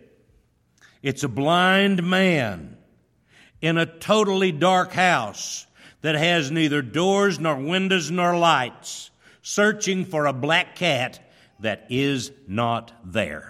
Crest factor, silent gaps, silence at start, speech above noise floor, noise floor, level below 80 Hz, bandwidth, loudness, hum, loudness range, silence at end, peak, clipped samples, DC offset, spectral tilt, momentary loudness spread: 18 dB; none; 1.05 s; 40 dB; -62 dBFS; -60 dBFS; 14.5 kHz; -22 LUFS; none; 3 LU; 0 s; -4 dBFS; under 0.1%; under 0.1%; -4.5 dB/octave; 11 LU